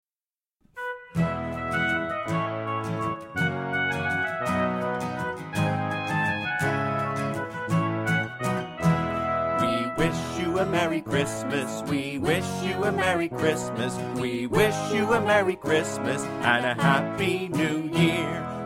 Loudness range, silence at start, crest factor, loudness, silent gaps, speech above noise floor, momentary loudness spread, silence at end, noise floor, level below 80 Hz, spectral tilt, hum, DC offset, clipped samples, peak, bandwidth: 3 LU; 0.75 s; 20 dB; -26 LUFS; none; over 65 dB; 7 LU; 0 s; under -90 dBFS; -52 dBFS; -5.5 dB/octave; none; under 0.1%; under 0.1%; -6 dBFS; 16.5 kHz